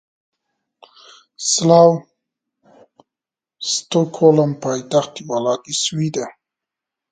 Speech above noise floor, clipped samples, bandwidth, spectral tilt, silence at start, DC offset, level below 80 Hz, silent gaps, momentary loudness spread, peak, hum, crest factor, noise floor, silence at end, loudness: 72 dB; under 0.1%; 9.4 kHz; -4.5 dB/octave; 1.4 s; under 0.1%; -66 dBFS; none; 13 LU; 0 dBFS; none; 20 dB; -88 dBFS; 0.8 s; -17 LUFS